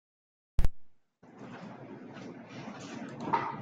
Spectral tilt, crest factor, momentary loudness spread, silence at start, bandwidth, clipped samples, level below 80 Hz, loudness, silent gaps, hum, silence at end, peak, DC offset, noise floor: -6.5 dB/octave; 22 dB; 14 LU; 0.6 s; 7.6 kHz; under 0.1%; -40 dBFS; -40 LUFS; none; none; 0 s; -12 dBFS; under 0.1%; -57 dBFS